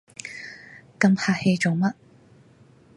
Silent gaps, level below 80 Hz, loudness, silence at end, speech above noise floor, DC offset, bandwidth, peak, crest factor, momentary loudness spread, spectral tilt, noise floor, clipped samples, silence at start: none; -66 dBFS; -22 LUFS; 1.05 s; 33 dB; under 0.1%; 11.5 kHz; -6 dBFS; 20 dB; 20 LU; -6 dB/octave; -54 dBFS; under 0.1%; 0.25 s